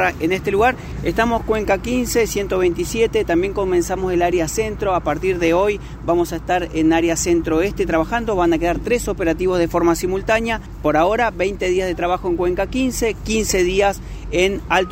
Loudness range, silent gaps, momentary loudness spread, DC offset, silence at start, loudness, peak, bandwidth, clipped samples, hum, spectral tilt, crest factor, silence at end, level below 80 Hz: 1 LU; none; 4 LU; under 0.1%; 0 s; -19 LUFS; -2 dBFS; 16 kHz; under 0.1%; none; -4.5 dB/octave; 16 dB; 0 s; -32 dBFS